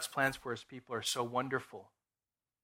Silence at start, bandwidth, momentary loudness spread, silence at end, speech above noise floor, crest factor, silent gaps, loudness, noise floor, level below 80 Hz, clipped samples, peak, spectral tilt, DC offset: 0 s; 16 kHz; 13 LU; 0.75 s; over 52 dB; 22 dB; none; -37 LUFS; under -90 dBFS; -70 dBFS; under 0.1%; -16 dBFS; -3 dB/octave; under 0.1%